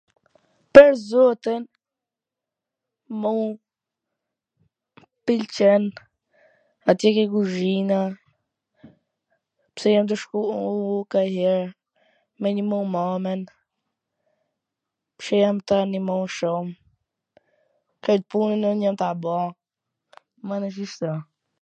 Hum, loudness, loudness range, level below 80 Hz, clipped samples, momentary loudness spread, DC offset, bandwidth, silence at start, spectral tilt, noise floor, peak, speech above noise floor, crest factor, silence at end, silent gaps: none; -21 LUFS; 7 LU; -62 dBFS; under 0.1%; 13 LU; under 0.1%; 8.8 kHz; 0.75 s; -6.5 dB/octave; -88 dBFS; 0 dBFS; 67 dB; 24 dB; 0.4 s; none